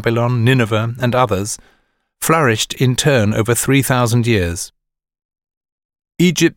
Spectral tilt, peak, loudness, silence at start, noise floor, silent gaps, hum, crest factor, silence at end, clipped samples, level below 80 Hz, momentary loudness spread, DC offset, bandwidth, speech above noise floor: -5 dB/octave; 0 dBFS; -15 LUFS; 0 s; -40 dBFS; 5.25-5.29 s, 5.57-5.61 s, 5.72-5.78 s, 5.85-5.89 s; none; 16 dB; 0.05 s; under 0.1%; -44 dBFS; 8 LU; under 0.1%; 17 kHz; 25 dB